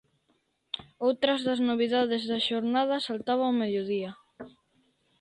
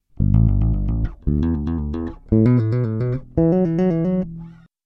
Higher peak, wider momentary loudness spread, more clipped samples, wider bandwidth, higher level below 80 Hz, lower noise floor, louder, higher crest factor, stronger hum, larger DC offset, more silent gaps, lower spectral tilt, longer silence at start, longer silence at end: second, -10 dBFS vs -4 dBFS; first, 14 LU vs 8 LU; neither; first, 10 kHz vs 5.6 kHz; second, -72 dBFS vs -26 dBFS; first, -72 dBFS vs -38 dBFS; second, -28 LUFS vs -20 LUFS; about the same, 18 dB vs 14 dB; neither; neither; neither; second, -5.5 dB/octave vs -11.5 dB/octave; first, 0.75 s vs 0.2 s; first, 0.7 s vs 0.35 s